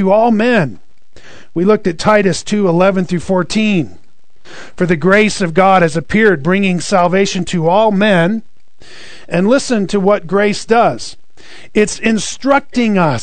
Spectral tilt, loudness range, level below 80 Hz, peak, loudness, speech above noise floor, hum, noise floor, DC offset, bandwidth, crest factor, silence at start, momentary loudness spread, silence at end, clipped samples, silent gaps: -5.5 dB/octave; 3 LU; -44 dBFS; 0 dBFS; -13 LUFS; 30 dB; none; -43 dBFS; 4%; 9.4 kHz; 14 dB; 0 s; 6 LU; 0 s; 0.2%; none